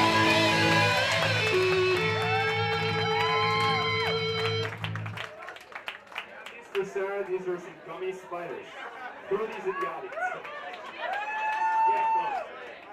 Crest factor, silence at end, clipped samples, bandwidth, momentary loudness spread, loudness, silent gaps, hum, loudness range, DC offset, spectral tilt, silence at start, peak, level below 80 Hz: 18 dB; 0 s; under 0.1%; 15.5 kHz; 17 LU; -27 LUFS; none; none; 11 LU; under 0.1%; -4.5 dB/octave; 0 s; -10 dBFS; -64 dBFS